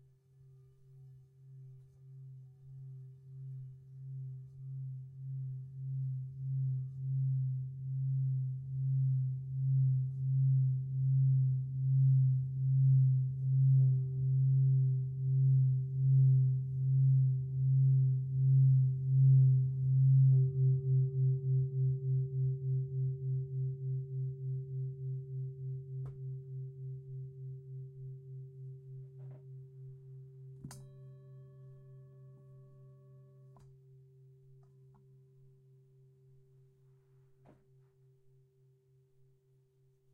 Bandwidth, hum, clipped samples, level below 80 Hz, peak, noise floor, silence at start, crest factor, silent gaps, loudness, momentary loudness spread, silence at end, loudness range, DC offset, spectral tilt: 0.6 kHz; none; under 0.1%; -70 dBFS; -20 dBFS; -70 dBFS; 0.95 s; 14 dB; none; -32 LUFS; 23 LU; 7.25 s; 22 LU; under 0.1%; -12.5 dB/octave